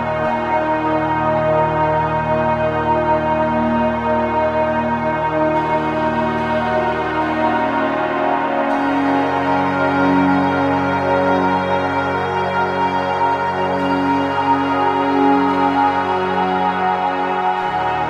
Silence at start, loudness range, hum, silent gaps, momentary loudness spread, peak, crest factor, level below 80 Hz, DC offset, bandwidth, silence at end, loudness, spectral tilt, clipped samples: 0 s; 2 LU; none; none; 3 LU; -2 dBFS; 14 dB; -42 dBFS; under 0.1%; 9.4 kHz; 0 s; -17 LUFS; -7 dB/octave; under 0.1%